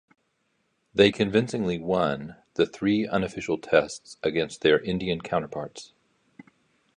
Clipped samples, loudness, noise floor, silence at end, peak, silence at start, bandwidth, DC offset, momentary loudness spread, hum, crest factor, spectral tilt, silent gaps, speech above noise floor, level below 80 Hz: under 0.1%; -26 LUFS; -73 dBFS; 1.1 s; -4 dBFS; 0.95 s; 10.5 kHz; under 0.1%; 14 LU; none; 22 dB; -5.5 dB/octave; none; 48 dB; -56 dBFS